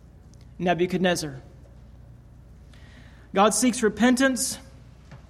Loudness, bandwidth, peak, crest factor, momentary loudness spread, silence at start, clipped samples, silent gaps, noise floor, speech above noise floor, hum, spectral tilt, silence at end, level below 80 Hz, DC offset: -23 LUFS; 16 kHz; -8 dBFS; 18 dB; 12 LU; 0.45 s; under 0.1%; none; -48 dBFS; 26 dB; none; -4 dB/octave; 0.15 s; -50 dBFS; under 0.1%